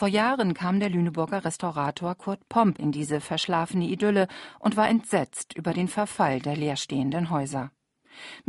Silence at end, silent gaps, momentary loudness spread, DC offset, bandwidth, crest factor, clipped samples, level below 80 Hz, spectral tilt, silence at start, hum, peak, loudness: 0.1 s; none; 9 LU; under 0.1%; 11.5 kHz; 18 dB; under 0.1%; -64 dBFS; -5.5 dB/octave; 0 s; none; -8 dBFS; -26 LUFS